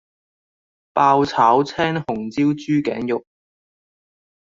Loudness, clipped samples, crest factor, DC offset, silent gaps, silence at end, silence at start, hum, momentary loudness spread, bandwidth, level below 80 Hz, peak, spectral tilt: -19 LUFS; under 0.1%; 18 dB; under 0.1%; none; 1.2 s; 0.95 s; none; 10 LU; 7.6 kHz; -58 dBFS; -2 dBFS; -6.5 dB/octave